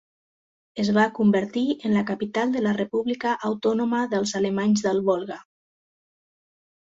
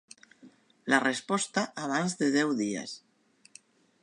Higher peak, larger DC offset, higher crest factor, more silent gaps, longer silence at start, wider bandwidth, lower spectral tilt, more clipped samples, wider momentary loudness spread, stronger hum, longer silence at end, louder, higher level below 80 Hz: about the same, -6 dBFS vs -8 dBFS; neither; second, 18 dB vs 24 dB; neither; first, 0.75 s vs 0.45 s; second, 7.8 kHz vs 11.5 kHz; first, -5.5 dB/octave vs -3.5 dB/octave; neither; second, 6 LU vs 14 LU; neither; first, 1.45 s vs 1.05 s; first, -24 LUFS vs -29 LUFS; first, -64 dBFS vs -80 dBFS